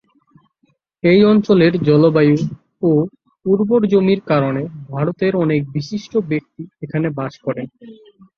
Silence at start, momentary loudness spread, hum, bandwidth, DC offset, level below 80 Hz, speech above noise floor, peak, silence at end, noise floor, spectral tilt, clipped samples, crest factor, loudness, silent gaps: 1.05 s; 14 LU; none; 6.8 kHz; under 0.1%; -56 dBFS; 47 dB; -2 dBFS; 0.45 s; -63 dBFS; -8.5 dB/octave; under 0.1%; 16 dB; -16 LUFS; none